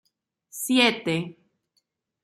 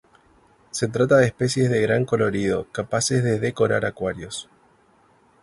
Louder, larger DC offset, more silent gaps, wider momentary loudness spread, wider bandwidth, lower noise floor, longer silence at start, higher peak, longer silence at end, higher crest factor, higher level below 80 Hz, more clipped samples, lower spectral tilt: about the same, -23 LUFS vs -22 LUFS; neither; neither; first, 19 LU vs 12 LU; first, 15.5 kHz vs 11.5 kHz; first, -74 dBFS vs -58 dBFS; second, 0.55 s vs 0.75 s; about the same, -6 dBFS vs -4 dBFS; about the same, 0.9 s vs 1 s; about the same, 22 dB vs 18 dB; second, -74 dBFS vs -52 dBFS; neither; second, -3.5 dB/octave vs -5 dB/octave